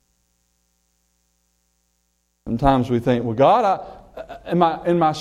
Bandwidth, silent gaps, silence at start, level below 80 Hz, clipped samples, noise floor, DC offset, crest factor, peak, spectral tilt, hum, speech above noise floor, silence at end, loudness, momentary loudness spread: 13 kHz; none; 2.45 s; -42 dBFS; under 0.1%; -69 dBFS; under 0.1%; 18 dB; -2 dBFS; -7.5 dB/octave; 60 Hz at -45 dBFS; 51 dB; 0 s; -19 LUFS; 22 LU